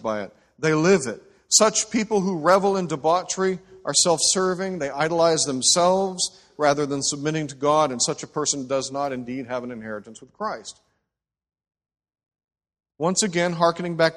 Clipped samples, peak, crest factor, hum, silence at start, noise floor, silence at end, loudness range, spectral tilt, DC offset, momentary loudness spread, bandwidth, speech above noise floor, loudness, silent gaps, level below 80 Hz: under 0.1%; -2 dBFS; 20 dB; none; 0.05 s; -83 dBFS; 0 s; 13 LU; -3 dB/octave; under 0.1%; 13 LU; 12.5 kHz; 61 dB; -22 LUFS; 12.44-12.48 s; -62 dBFS